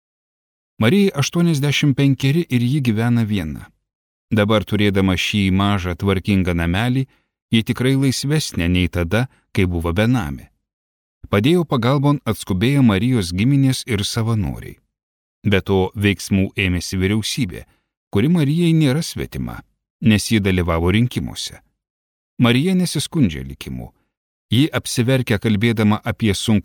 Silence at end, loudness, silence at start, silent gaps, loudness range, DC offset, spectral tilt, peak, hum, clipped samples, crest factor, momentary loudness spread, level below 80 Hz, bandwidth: 0.05 s; -18 LUFS; 0.8 s; 3.95-4.28 s, 7.42-7.49 s, 10.73-11.21 s, 15.03-15.42 s, 17.97-18.11 s, 19.90-19.99 s, 21.90-22.37 s, 24.17-24.49 s; 3 LU; under 0.1%; -6 dB/octave; -4 dBFS; none; under 0.1%; 14 dB; 10 LU; -40 dBFS; 18 kHz